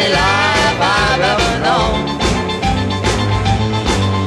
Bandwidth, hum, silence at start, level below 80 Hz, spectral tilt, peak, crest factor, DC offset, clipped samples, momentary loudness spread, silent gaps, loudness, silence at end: 12.5 kHz; none; 0 s; -26 dBFS; -4.5 dB/octave; -2 dBFS; 12 dB; under 0.1%; under 0.1%; 5 LU; none; -14 LUFS; 0 s